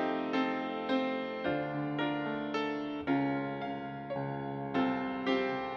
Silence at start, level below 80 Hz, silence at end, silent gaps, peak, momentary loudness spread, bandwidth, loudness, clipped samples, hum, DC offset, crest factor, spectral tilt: 0 s; -68 dBFS; 0 s; none; -18 dBFS; 6 LU; 6.8 kHz; -34 LUFS; under 0.1%; none; under 0.1%; 16 dB; -7.5 dB/octave